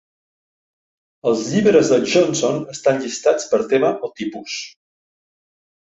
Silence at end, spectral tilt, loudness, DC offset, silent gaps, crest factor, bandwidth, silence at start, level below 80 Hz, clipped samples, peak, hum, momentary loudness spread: 1.3 s; -4.5 dB/octave; -18 LUFS; under 0.1%; none; 18 dB; 8 kHz; 1.25 s; -62 dBFS; under 0.1%; -2 dBFS; none; 13 LU